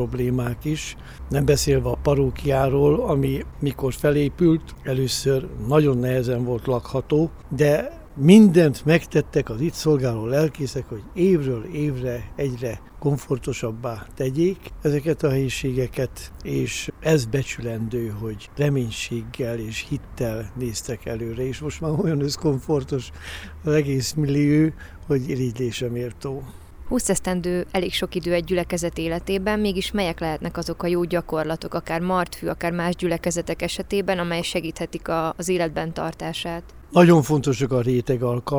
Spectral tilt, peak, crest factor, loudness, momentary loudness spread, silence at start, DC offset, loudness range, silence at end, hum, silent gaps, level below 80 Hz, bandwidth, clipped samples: -6 dB/octave; 0 dBFS; 22 dB; -23 LUFS; 10 LU; 0 s; under 0.1%; 8 LU; 0 s; none; none; -40 dBFS; over 20 kHz; under 0.1%